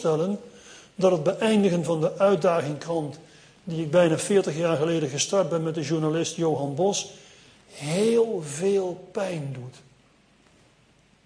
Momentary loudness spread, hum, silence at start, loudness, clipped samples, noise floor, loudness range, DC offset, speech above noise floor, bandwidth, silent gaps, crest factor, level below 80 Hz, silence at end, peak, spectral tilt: 14 LU; none; 0 s; -24 LUFS; under 0.1%; -60 dBFS; 4 LU; under 0.1%; 36 dB; 10.5 kHz; none; 18 dB; -66 dBFS; 1.5 s; -8 dBFS; -5 dB/octave